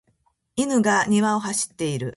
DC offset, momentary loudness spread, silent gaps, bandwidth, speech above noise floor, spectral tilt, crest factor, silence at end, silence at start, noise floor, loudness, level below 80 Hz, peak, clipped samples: under 0.1%; 8 LU; none; 11.5 kHz; 46 dB; -4 dB/octave; 16 dB; 0 s; 0.55 s; -67 dBFS; -22 LUFS; -60 dBFS; -8 dBFS; under 0.1%